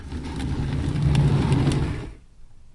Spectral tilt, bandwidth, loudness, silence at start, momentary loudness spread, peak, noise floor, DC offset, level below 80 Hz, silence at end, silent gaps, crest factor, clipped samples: -7.5 dB/octave; 11.5 kHz; -23 LUFS; 0 s; 13 LU; -10 dBFS; -44 dBFS; under 0.1%; -32 dBFS; 0.15 s; none; 14 dB; under 0.1%